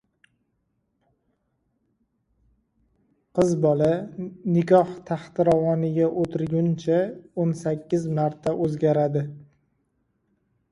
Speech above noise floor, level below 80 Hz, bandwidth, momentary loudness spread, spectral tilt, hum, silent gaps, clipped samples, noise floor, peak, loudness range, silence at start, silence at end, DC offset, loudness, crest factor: 51 dB; -60 dBFS; 11 kHz; 10 LU; -8.5 dB/octave; none; none; under 0.1%; -73 dBFS; -4 dBFS; 5 LU; 3.35 s; 1.3 s; under 0.1%; -23 LUFS; 20 dB